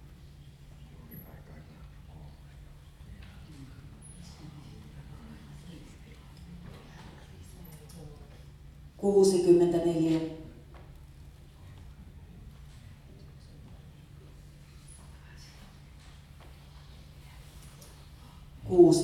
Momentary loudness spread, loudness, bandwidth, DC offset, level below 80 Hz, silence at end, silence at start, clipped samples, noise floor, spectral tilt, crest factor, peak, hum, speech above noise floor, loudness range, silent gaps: 26 LU; -25 LUFS; 13 kHz; under 0.1%; -54 dBFS; 0 s; 1.1 s; under 0.1%; -51 dBFS; -6.5 dB/octave; 24 dB; -8 dBFS; none; 27 dB; 23 LU; none